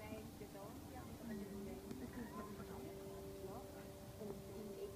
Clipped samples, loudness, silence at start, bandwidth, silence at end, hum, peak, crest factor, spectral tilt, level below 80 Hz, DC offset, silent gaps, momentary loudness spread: under 0.1%; -52 LUFS; 0 s; 15.5 kHz; 0 s; none; -34 dBFS; 18 dB; -6 dB/octave; -64 dBFS; under 0.1%; none; 4 LU